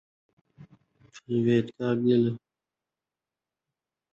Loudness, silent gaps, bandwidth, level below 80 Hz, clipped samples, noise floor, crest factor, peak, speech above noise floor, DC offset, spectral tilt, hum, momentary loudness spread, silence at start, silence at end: -26 LUFS; none; 7.4 kHz; -68 dBFS; under 0.1%; -90 dBFS; 18 dB; -12 dBFS; 65 dB; under 0.1%; -8.5 dB/octave; none; 7 LU; 0.6 s; 1.75 s